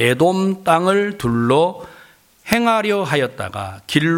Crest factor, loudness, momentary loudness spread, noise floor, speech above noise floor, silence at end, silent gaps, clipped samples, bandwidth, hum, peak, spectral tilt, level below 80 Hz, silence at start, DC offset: 18 dB; -17 LUFS; 12 LU; -48 dBFS; 31 dB; 0 s; none; under 0.1%; 17 kHz; none; 0 dBFS; -5.5 dB/octave; -50 dBFS; 0 s; under 0.1%